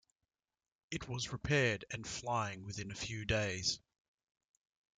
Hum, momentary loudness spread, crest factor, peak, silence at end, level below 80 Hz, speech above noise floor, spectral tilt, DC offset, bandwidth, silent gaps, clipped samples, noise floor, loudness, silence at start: none; 12 LU; 22 dB; -18 dBFS; 1.2 s; -60 dBFS; over 52 dB; -4 dB/octave; under 0.1%; 9.6 kHz; none; under 0.1%; under -90 dBFS; -38 LUFS; 0.9 s